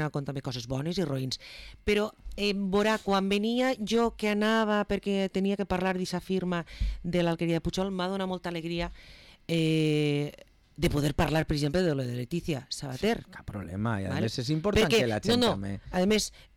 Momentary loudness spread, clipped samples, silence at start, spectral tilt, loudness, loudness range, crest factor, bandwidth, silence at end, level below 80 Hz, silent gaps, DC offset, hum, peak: 9 LU; under 0.1%; 0 s; -5.5 dB/octave; -29 LUFS; 3 LU; 12 dB; 17.5 kHz; 0.2 s; -44 dBFS; none; under 0.1%; none; -18 dBFS